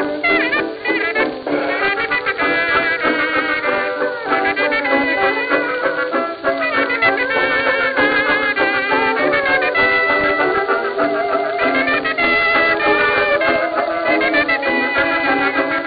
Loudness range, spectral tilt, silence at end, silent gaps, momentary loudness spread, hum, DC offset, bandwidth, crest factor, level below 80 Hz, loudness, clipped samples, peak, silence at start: 2 LU; -7.5 dB/octave; 0 s; none; 5 LU; none; under 0.1%; 5 kHz; 14 dB; -50 dBFS; -16 LUFS; under 0.1%; -2 dBFS; 0 s